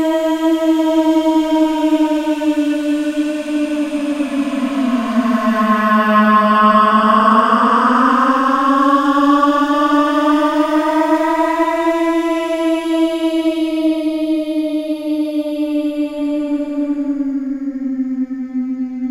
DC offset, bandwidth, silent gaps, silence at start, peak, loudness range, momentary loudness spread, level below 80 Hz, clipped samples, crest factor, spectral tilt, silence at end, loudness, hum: under 0.1%; 14 kHz; none; 0 s; 0 dBFS; 7 LU; 9 LU; -52 dBFS; under 0.1%; 14 dB; -5.5 dB/octave; 0 s; -15 LUFS; none